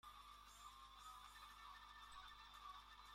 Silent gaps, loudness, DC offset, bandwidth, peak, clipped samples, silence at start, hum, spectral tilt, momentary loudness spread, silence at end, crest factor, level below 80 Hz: none; -60 LUFS; under 0.1%; 16 kHz; -46 dBFS; under 0.1%; 0.05 s; 50 Hz at -70 dBFS; -1 dB/octave; 2 LU; 0 s; 14 dB; -72 dBFS